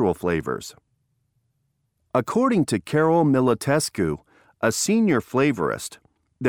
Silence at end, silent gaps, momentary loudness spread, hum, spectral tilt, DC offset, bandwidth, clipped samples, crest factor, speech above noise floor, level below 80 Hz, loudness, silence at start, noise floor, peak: 0 s; none; 12 LU; none; -5.5 dB/octave; under 0.1%; 19 kHz; under 0.1%; 18 dB; 51 dB; -54 dBFS; -22 LUFS; 0 s; -72 dBFS; -4 dBFS